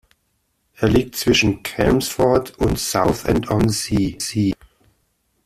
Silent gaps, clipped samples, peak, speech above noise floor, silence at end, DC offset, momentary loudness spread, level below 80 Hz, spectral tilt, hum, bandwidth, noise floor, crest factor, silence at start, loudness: none; under 0.1%; -2 dBFS; 50 dB; 0.95 s; under 0.1%; 5 LU; -36 dBFS; -5 dB/octave; none; 16 kHz; -68 dBFS; 18 dB; 0.8 s; -19 LUFS